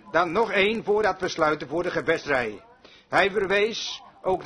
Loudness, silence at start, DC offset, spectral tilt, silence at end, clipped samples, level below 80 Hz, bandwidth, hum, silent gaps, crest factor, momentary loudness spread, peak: -24 LUFS; 0.05 s; under 0.1%; -4 dB/octave; 0 s; under 0.1%; -56 dBFS; 10.5 kHz; none; none; 20 dB; 7 LU; -4 dBFS